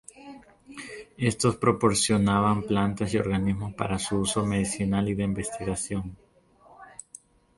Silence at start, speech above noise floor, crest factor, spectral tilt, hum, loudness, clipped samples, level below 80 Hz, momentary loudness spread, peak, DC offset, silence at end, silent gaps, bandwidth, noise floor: 0.15 s; 32 dB; 20 dB; -5 dB/octave; none; -26 LUFS; under 0.1%; -48 dBFS; 21 LU; -8 dBFS; under 0.1%; 0.7 s; none; 11.5 kHz; -57 dBFS